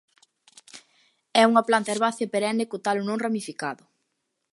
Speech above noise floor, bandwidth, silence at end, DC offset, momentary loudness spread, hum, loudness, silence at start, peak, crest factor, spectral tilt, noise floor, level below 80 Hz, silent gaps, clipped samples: 54 dB; 11.5 kHz; 0.8 s; under 0.1%; 14 LU; none; -24 LUFS; 0.75 s; -4 dBFS; 22 dB; -4 dB/octave; -78 dBFS; -80 dBFS; none; under 0.1%